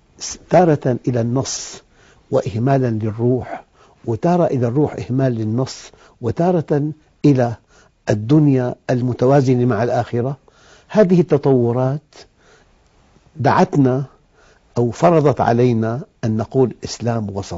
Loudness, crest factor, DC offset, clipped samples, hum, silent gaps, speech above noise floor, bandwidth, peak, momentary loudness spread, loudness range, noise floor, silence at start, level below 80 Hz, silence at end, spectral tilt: -17 LUFS; 16 dB; under 0.1%; under 0.1%; none; none; 37 dB; 7.8 kHz; 0 dBFS; 12 LU; 3 LU; -54 dBFS; 0.2 s; -50 dBFS; 0 s; -7 dB/octave